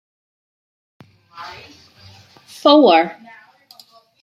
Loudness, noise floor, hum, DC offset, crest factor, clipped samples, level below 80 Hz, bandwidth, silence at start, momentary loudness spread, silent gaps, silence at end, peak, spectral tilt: -13 LUFS; -49 dBFS; none; under 0.1%; 18 dB; under 0.1%; -68 dBFS; 13 kHz; 1.4 s; 25 LU; none; 1.1 s; -2 dBFS; -5 dB/octave